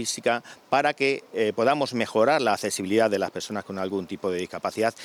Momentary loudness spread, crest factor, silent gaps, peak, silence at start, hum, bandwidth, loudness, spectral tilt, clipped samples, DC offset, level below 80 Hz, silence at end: 8 LU; 16 dB; none; -8 dBFS; 0 s; none; 18.5 kHz; -25 LUFS; -3.5 dB/octave; under 0.1%; under 0.1%; -74 dBFS; 0 s